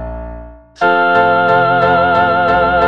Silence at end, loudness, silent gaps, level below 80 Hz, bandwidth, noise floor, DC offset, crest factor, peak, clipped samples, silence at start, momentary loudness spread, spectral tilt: 0 s; -11 LUFS; none; -34 dBFS; 6.8 kHz; -32 dBFS; under 0.1%; 12 dB; 0 dBFS; under 0.1%; 0 s; 14 LU; -7 dB/octave